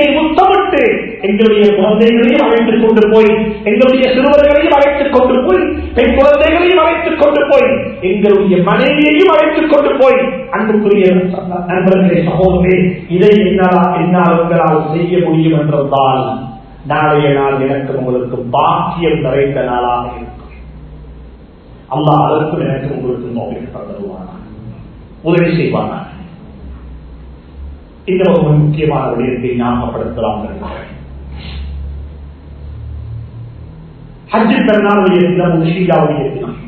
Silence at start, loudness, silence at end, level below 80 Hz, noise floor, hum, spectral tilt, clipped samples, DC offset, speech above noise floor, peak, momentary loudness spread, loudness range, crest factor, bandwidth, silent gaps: 0 s; -11 LUFS; 0 s; -32 dBFS; -36 dBFS; none; -9 dB/octave; 0.3%; under 0.1%; 26 dB; 0 dBFS; 19 LU; 9 LU; 12 dB; 6.8 kHz; none